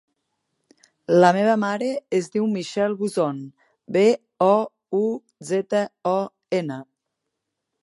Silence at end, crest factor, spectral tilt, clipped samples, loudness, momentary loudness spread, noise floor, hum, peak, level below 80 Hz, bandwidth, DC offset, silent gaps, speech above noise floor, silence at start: 1 s; 22 dB; -6 dB/octave; under 0.1%; -22 LUFS; 11 LU; -80 dBFS; none; -2 dBFS; -74 dBFS; 11.5 kHz; under 0.1%; none; 60 dB; 1.1 s